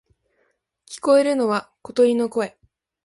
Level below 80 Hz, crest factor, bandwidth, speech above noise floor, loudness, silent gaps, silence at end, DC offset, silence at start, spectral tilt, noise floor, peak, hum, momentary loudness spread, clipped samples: -68 dBFS; 16 dB; 11.5 kHz; 49 dB; -20 LUFS; none; 0.55 s; under 0.1%; 0.9 s; -4.5 dB/octave; -69 dBFS; -6 dBFS; none; 12 LU; under 0.1%